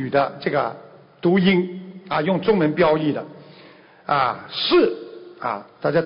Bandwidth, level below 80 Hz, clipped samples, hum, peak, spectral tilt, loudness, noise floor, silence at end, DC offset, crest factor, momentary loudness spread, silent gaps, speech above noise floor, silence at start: 5.4 kHz; -58 dBFS; under 0.1%; none; -6 dBFS; -11 dB/octave; -21 LUFS; -47 dBFS; 0 s; under 0.1%; 14 dB; 17 LU; none; 28 dB; 0 s